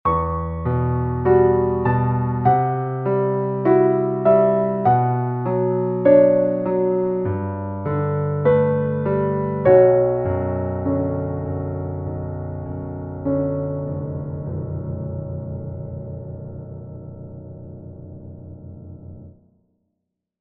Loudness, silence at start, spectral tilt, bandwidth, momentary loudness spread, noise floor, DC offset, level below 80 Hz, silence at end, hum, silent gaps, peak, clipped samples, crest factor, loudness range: -20 LUFS; 0.05 s; -10 dB/octave; 3.8 kHz; 21 LU; -78 dBFS; under 0.1%; -42 dBFS; 1.1 s; none; none; -2 dBFS; under 0.1%; 18 dB; 18 LU